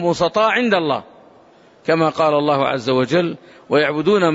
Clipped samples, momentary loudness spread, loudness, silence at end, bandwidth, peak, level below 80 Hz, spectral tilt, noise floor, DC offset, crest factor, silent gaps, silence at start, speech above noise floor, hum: under 0.1%; 8 LU; -17 LUFS; 0 s; 8 kHz; -4 dBFS; -58 dBFS; -6 dB/octave; -49 dBFS; under 0.1%; 14 dB; none; 0 s; 32 dB; none